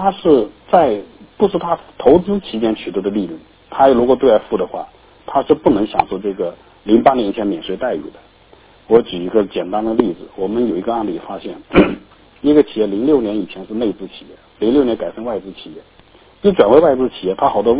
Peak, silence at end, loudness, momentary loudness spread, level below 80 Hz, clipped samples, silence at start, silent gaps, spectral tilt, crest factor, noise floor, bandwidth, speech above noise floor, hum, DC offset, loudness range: 0 dBFS; 0 s; -16 LUFS; 14 LU; -44 dBFS; 0.2%; 0 s; none; -10.5 dB/octave; 16 dB; -47 dBFS; 4 kHz; 31 dB; none; under 0.1%; 3 LU